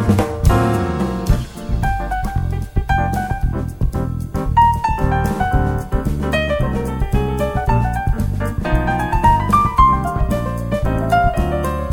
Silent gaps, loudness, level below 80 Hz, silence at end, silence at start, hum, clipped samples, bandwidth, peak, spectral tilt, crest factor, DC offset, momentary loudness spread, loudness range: none; -18 LUFS; -22 dBFS; 0 s; 0 s; none; under 0.1%; 17.5 kHz; 0 dBFS; -7 dB/octave; 16 dB; 0.1%; 8 LU; 4 LU